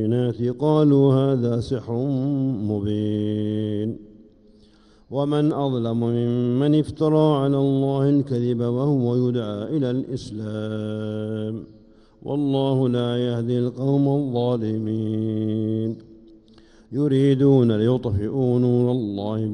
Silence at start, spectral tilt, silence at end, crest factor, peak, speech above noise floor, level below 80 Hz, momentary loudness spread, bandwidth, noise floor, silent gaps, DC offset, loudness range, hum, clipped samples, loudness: 0 s; -9.5 dB/octave; 0 s; 16 dB; -6 dBFS; 32 dB; -54 dBFS; 10 LU; 10 kHz; -53 dBFS; none; under 0.1%; 5 LU; none; under 0.1%; -22 LUFS